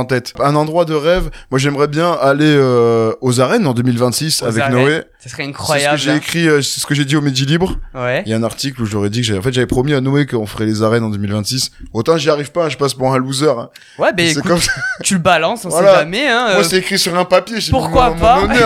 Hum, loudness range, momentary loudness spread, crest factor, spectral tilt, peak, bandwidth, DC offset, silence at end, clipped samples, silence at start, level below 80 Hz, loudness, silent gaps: none; 4 LU; 7 LU; 14 dB; -4.5 dB/octave; 0 dBFS; 16.5 kHz; under 0.1%; 0 s; under 0.1%; 0 s; -34 dBFS; -14 LUFS; none